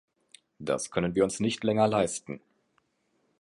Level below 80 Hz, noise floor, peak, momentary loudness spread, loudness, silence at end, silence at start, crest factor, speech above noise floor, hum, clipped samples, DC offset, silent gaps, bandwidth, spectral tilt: -60 dBFS; -74 dBFS; -12 dBFS; 16 LU; -28 LUFS; 1.05 s; 0.6 s; 18 dB; 46 dB; none; under 0.1%; under 0.1%; none; 11.5 kHz; -5 dB/octave